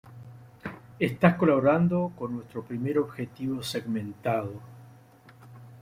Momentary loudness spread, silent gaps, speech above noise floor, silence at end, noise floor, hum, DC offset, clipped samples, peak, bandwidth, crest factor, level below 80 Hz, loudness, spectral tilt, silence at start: 19 LU; none; 27 dB; 0 s; -53 dBFS; none; under 0.1%; under 0.1%; -4 dBFS; 15.5 kHz; 24 dB; -62 dBFS; -27 LUFS; -7.5 dB/octave; 0.05 s